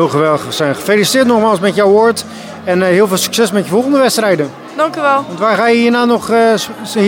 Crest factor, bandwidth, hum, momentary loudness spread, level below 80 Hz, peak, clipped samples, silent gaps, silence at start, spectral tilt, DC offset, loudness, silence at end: 12 dB; 18 kHz; none; 7 LU; -58 dBFS; 0 dBFS; under 0.1%; none; 0 s; -4.5 dB/octave; under 0.1%; -12 LUFS; 0 s